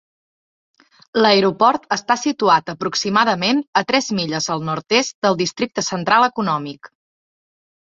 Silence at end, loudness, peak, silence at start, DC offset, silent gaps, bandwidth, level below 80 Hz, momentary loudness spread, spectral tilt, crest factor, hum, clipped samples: 1.05 s; -18 LUFS; 0 dBFS; 1.15 s; under 0.1%; 3.68-3.73 s, 5.14-5.22 s; 8 kHz; -62 dBFS; 7 LU; -3.5 dB/octave; 18 dB; none; under 0.1%